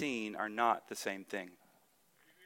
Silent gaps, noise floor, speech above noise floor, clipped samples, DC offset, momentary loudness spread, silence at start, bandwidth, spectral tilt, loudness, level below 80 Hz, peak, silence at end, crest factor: none; -71 dBFS; 33 dB; under 0.1%; under 0.1%; 11 LU; 0 s; 17 kHz; -3.5 dB/octave; -37 LUFS; -84 dBFS; -16 dBFS; 0 s; 22 dB